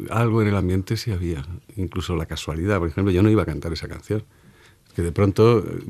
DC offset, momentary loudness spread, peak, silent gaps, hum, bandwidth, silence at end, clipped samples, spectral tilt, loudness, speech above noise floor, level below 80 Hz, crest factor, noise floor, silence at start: under 0.1%; 13 LU; -4 dBFS; none; none; 14 kHz; 0 s; under 0.1%; -7.5 dB/octave; -22 LUFS; 31 dB; -40 dBFS; 18 dB; -52 dBFS; 0 s